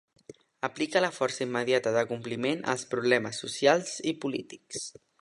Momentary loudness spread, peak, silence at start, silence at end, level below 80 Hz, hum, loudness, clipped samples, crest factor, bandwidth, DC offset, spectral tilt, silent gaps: 13 LU; -8 dBFS; 0.3 s; 0.3 s; -74 dBFS; none; -29 LUFS; under 0.1%; 22 dB; 11.5 kHz; under 0.1%; -3.5 dB/octave; none